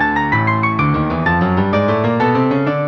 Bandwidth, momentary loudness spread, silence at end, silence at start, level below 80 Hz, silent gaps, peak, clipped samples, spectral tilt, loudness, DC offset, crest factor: 6.6 kHz; 1 LU; 0 s; 0 s; -38 dBFS; none; -2 dBFS; under 0.1%; -8.5 dB/octave; -15 LUFS; under 0.1%; 12 dB